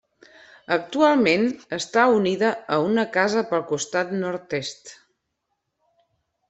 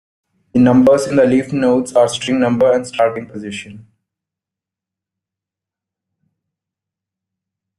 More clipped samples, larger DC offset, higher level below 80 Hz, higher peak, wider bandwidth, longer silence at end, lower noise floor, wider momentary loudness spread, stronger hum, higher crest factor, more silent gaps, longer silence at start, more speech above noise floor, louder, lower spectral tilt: neither; neither; second, -66 dBFS vs -56 dBFS; about the same, -4 dBFS vs -2 dBFS; second, 8.4 kHz vs 12 kHz; second, 1.55 s vs 3.95 s; second, -77 dBFS vs -86 dBFS; second, 11 LU vs 16 LU; neither; about the same, 20 dB vs 16 dB; neither; first, 0.7 s vs 0.55 s; second, 56 dB vs 72 dB; second, -22 LUFS vs -14 LUFS; second, -4.5 dB/octave vs -6 dB/octave